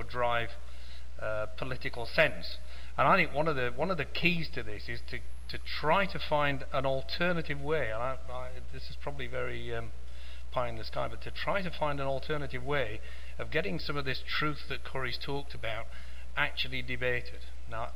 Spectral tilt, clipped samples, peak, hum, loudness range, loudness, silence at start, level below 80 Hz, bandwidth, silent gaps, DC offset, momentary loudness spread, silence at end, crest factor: -5.5 dB/octave; under 0.1%; -8 dBFS; none; 7 LU; -33 LUFS; 0 s; -46 dBFS; 16 kHz; none; 3%; 15 LU; 0 s; 24 dB